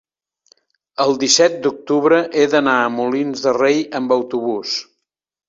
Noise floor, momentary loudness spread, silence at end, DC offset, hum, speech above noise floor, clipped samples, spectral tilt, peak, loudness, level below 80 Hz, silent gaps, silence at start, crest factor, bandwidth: -75 dBFS; 9 LU; 0.65 s; under 0.1%; none; 58 dB; under 0.1%; -3 dB/octave; 0 dBFS; -16 LUFS; -64 dBFS; none; 1 s; 18 dB; 7.8 kHz